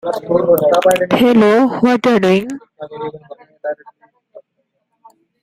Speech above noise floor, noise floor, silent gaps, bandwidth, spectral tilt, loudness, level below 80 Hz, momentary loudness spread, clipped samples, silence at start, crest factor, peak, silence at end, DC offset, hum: 56 dB; -69 dBFS; none; 16 kHz; -6 dB/octave; -12 LUFS; -54 dBFS; 18 LU; under 0.1%; 0.05 s; 16 dB; 0 dBFS; 1.05 s; under 0.1%; none